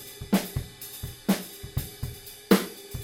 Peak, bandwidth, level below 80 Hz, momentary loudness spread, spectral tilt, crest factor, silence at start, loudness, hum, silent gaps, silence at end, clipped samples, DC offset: -4 dBFS; 17 kHz; -46 dBFS; 14 LU; -5 dB/octave; 26 dB; 0 s; -29 LUFS; none; none; 0 s; under 0.1%; under 0.1%